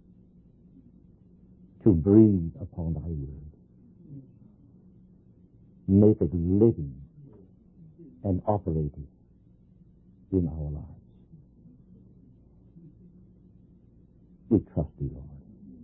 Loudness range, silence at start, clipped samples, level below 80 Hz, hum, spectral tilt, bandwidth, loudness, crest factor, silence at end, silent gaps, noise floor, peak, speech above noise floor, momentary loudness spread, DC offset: 11 LU; 1.85 s; under 0.1%; -44 dBFS; none; -15 dB/octave; 2.9 kHz; -26 LUFS; 22 dB; 0 s; none; -58 dBFS; -6 dBFS; 34 dB; 28 LU; under 0.1%